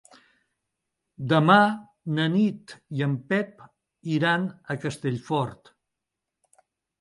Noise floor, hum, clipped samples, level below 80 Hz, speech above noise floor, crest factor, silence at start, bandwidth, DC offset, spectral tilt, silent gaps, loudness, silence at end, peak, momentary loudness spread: -85 dBFS; none; under 0.1%; -68 dBFS; 61 dB; 24 dB; 1.2 s; 11.5 kHz; under 0.1%; -7 dB/octave; none; -25 LUFS; 1.45 s; -4 dBFS; 17 LU